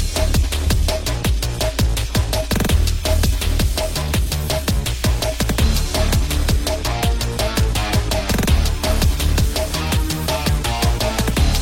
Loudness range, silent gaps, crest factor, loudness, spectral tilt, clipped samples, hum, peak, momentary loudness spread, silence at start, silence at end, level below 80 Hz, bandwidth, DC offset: 1 LU; none; 14 dB; -19 LUFS; -4.5 dB/octave; under 0.1%; none; -2 dBFS; 3 LU; 0 s; 0 s; -20 dBFS; 16.5 kHz; under 0.1%